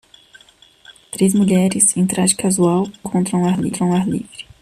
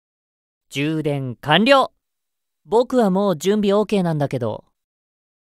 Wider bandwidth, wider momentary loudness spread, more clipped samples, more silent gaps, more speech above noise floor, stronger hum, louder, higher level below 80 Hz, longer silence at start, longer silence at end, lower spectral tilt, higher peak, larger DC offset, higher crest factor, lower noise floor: about the same, 14 kHz vs 15 kHz; about the same, 9 LU vs 11 LU; neither; neither; second, 33 dB vs 65 dB; neither; first, -16 LUFS vs -19 LUFS; first, -52 dBFS vs -58 dBFS; first, 0.9 s vs 0.7 s; second, 0.2 s vs 0.9 s; about the same, -5 dB/octave vs -6 dB/octave; about the same, 0 dBFS vs 0 dBFS; neither; about the same, 18 dB vs 20 dB; second, -49 dBFS vs -83 dBFS